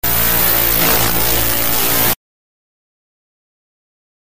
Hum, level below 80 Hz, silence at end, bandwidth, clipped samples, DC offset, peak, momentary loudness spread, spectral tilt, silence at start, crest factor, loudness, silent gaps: none; -32 dBFS; 2.15 s; 16 kHz; under 0.1%; 8%; -2 dBFS; 3 LU; -2.5 dB/octave; 0 s; 16 dB; -12 LUFS; none